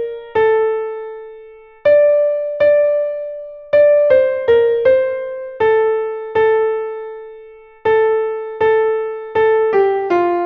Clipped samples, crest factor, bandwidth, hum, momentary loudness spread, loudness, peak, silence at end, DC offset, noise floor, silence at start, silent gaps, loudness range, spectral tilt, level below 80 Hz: under 0.1%; 14 dB; 5 kHz; none; 15 LU; -15 LUFS; -2 dBFS; 0 s; under 0.1%; -39 dBFS; 0 s; none; 4 LU; -7 dB/octave; -54 dBFS